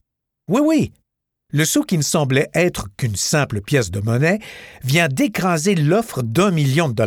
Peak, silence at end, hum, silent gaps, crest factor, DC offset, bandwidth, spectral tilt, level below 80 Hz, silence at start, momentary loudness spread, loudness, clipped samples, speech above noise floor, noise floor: -4 dBFS; 0 s; none; none; 16 dB; under 0.1%; 18 kHz; -5 dB/octave; -48 dBFS; 0.5 s; 7 LU; -18 LUFS; under 0.1%; 55 dB; -73 dBFS